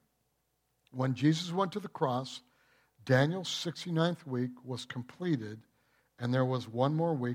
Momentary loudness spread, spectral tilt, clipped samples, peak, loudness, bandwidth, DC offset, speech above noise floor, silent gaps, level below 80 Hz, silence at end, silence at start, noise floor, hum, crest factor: 14 LU; -6 dB/octave; under 0.1%; -14 dBFS; -33 LUFS; 14 kHz; under 0.1%; 46 dB; none; -78 dBFS; 0 s; 0.95 s; -78 dBFS; none; 20 dB